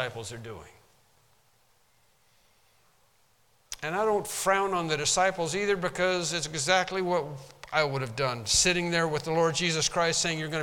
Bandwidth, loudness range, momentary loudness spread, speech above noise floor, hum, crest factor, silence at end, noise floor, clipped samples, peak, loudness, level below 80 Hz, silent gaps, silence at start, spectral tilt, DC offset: 18 kHz; 9 LU; 14 LU; 39 dB; none; 20 dB; 0 s; -67 dBFS; under 0.1%; -8 dBFS; -27 LUFS; -56 dBFS; none; 0 s; -2.5 dB/octave; under 0.1%